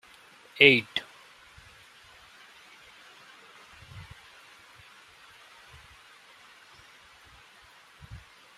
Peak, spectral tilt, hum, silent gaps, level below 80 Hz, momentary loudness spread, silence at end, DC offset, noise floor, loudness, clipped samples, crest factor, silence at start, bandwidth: -2 dBFS; -4.5 dB/octave; none; none; -64 dBFS; 32 LU; 7.6 s; under 0.1%; -55 dBFS; -21 LUFS; under 0.1%; 32 dB; 0.6 s; 15 kHz